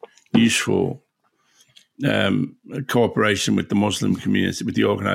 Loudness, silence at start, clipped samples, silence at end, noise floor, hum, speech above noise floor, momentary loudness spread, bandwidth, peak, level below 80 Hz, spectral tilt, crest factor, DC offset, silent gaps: -20 LUFS; 0.35 s; under 0.1%; 0 s; -66 dBFS; none; 46 dB; 8 LU; 16.5 kHz; -4 dBFS; -60 dBFS; -5 dB/octave; 18 dB; under 0.1%; none